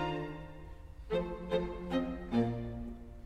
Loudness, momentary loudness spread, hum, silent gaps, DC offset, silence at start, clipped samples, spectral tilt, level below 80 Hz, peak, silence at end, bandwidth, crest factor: -37 LUFS; 17 LU; none; none; under 0.1%; 0 s; under 0.1%; -8 dB/octave; -48 dBFS; -18 dBFS; 0 s; 10.5 kHz; 18 dB